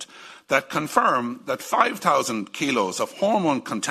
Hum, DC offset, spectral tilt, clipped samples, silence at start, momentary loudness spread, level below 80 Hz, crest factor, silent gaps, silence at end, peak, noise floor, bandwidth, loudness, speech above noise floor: none; under 0.1%; -3.5 dB/octave; under 0.1%; 0 s; 8 LU; -66 dBFS; 22 dB; none; 0 s; -2 dBFS; -42 dBFS; 14 kHz; -23 LUFS; 20 dB